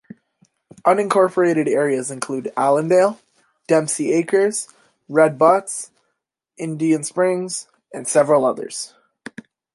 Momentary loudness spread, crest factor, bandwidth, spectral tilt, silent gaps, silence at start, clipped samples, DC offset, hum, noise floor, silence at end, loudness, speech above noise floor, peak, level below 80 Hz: 16 LU; 18 dB; 11.5 kHz; -5 dB/octave; none; 0.85 s; under 0.1%; under 0.1%; none; -76 dBFS; 0.9 s; -19 LUFS; 58 dB; -2 dBFS; -72 dBFS